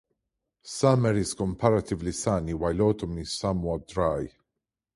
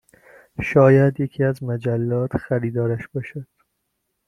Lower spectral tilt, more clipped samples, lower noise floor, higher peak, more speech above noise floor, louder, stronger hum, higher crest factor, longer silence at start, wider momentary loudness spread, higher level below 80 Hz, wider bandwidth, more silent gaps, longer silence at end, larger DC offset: second, -6 dB/octave vs -9.5 dB/octave; neither; first, -86 dBFS vs -75 dBFS; second, -6 dBFS vs -2 dBFS; first, 60 dB vs 55 dB; second, -27 LUFS vs -20 LUFS; neither; about the same, 22 dB vs 18 dB; about the same, 0.65 s vs 0.6 s; second, 8 LU vs 16 LU; first, -46 dBFS vs -52 dBFS; first, 11.5 kHz vs 9.8 kHz; neither; second, 0.65 s vs 0.85 s; neither